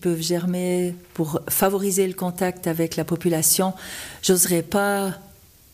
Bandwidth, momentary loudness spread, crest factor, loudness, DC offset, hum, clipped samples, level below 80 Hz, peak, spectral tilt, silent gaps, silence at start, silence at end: 15.5 kHz; 10 LU; 16 dB; -22 LUFS; under 0.1%; none; under 0.1%; -54 dBFS; -6 dBFS; -4 dB/octave; none; 0 s; 0.5 s